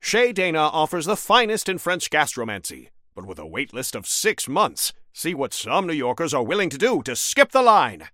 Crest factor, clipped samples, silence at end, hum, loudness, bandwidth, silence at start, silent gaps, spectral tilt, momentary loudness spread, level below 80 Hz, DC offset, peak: 22 dB; under 0.1%; 0.05 s; none; -21 LUFS; 17 kHz; 0.05 s; none; -2.5 dB/octave; 12 LU; -60 dBFS; under 0.1%; 0 dBFS